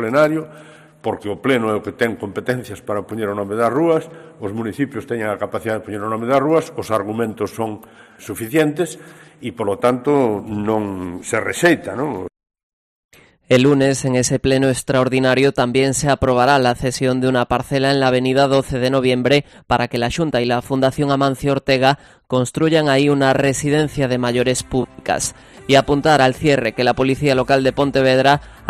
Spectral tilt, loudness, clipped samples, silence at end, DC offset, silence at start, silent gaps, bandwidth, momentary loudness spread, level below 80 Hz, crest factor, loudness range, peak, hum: -5 dB/octave; -17 LUFS; under 0.1%; 0 s; under 0.1%; 0 s; 12.63-13.09 s; 14.5 kHz; 11 LU; -44 dBFS; 18 dB; 5 LU; 0 dBFS; none